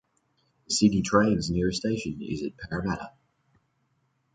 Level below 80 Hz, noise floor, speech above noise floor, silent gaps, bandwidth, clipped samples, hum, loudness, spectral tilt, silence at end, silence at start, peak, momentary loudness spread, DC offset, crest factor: -50 dBFS; -72 dBFS; 46 dB; none; 9.6 kHz; under 0.1%; none; -27 LUFS; -5 dB/octave; 1.25 s; 0.7 s; -8 dBFS; 11 LU; under 0.1%; 22 dB